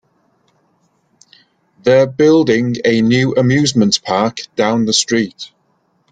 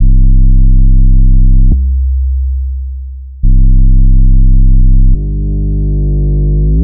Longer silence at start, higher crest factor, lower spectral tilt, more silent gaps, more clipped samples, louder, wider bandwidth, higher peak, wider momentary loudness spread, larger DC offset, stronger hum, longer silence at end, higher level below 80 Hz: first, 1.85 s vs 0 s; first, 16 dB vs 4 dB; second, -4.5 dB/octave vs -19 dB/octave; neither; neither; about the same, -13 LUFS vs -12 LUFS; first, 9.4 kHz vs 0.6 kHz; about the same, 0 dBFS vs -2 dBFS; about the same, 8 LU vs 7 LU; neither; neither; first, 0.65 s vs 0 s; second, -52 dBFS vs -6 dBFS